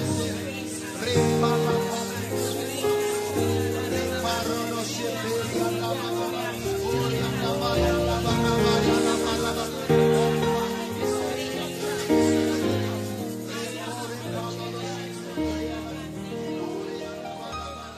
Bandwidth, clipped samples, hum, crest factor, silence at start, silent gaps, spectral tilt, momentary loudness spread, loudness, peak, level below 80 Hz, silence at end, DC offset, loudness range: 15.5 kHz; under 0.1%; none; 16 dB; 0 s; none; -5 dB/octave; 11 LU; -26 LUFS; -8 dBFS; -44 dBFS; 0 s; under 0.1%; 8 LU